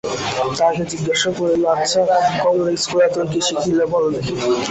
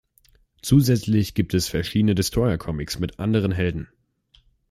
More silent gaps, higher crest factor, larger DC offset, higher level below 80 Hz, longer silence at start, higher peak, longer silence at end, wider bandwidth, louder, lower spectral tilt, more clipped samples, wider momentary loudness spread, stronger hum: neither; about the same, 14 dB vs 18 dB; neither; second, -50 dBFS vs -42 dBFS; second, 0.05 s vs 0.65 s; about the same, -4 dBFS vs -6 dBFS; second, 0 s vs 0.85 s; second, 8.4 kHz vs 16 kHz; first, -18 LUFS vs -22 LUFS; second, -4 dB/octave vs -6 dB/octave; neither; second, 5 LU vs 10 LU; neither